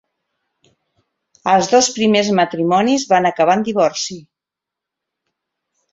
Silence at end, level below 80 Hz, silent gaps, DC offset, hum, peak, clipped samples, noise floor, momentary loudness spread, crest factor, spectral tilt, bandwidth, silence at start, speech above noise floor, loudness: 1.75 s; -60 dBFS; none; under 0.1%; none; -2 dBFS; under 0.1%; -85 dBFS; 11 LU; 16 dB; -4 dB/octave; 8 kHz; 1.45 s; 70 dB; -15 LUFS